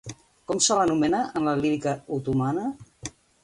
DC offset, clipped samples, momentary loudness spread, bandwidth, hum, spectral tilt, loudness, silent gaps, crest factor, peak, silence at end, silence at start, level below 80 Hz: under 0.1%; under 0.1%; 19 LU; 11.5 kHz; none; -4.5 dB/octave; -25 LUFS; none; 20 dB; -6 dBFS; 0.35 s; 0.05 s; -56 dBFS